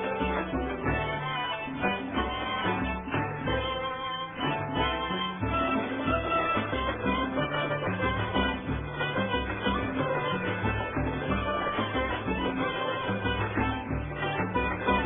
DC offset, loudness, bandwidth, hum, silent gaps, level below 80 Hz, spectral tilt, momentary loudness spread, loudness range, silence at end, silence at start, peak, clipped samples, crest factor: under 0.1%; -30 LUFS; 4 kHz; none; none; -42 dBFS; -3.5 dB/octave; 3 LU; 2 LU; 0 s; 0 s; -12 dBFS; under 0.1%; 18 dB